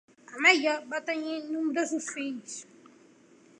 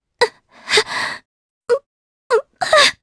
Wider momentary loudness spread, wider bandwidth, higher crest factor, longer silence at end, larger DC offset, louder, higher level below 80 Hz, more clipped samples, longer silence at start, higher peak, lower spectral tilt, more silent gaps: about the same, 19 LU vs 18 LU; about the same, 11 kHz vs 11 kHz; about the same, 22 dB vs 20 dB; first, 0.95 s vs 0.1 s; neither; second, -27 LUFS vs -17 LUFS; second, -88 dBFS vs -58 dBFS; neither; about the same, 0.3 s vs 0.2 s; second, -8 dBFS vs 0 dBFS; about the same, -1 dB/octave vs 0 dB/octave; second, none vs 1.25-1.61 s, 1.86-2.30 s